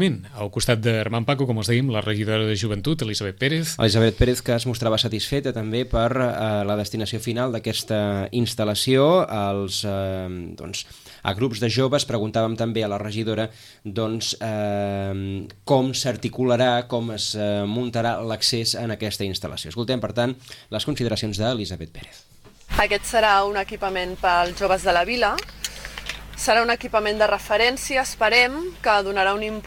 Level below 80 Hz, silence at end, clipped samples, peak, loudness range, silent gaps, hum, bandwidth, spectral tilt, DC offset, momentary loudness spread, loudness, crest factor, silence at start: -42 dBFS; 0 s; under 0.1%; -4 dBFS; 4 LU; none; none; 17 kHz; -4.5 dB/octave; under 0.1%; 11 LU; -22 LUFS; 18 dB; 0 s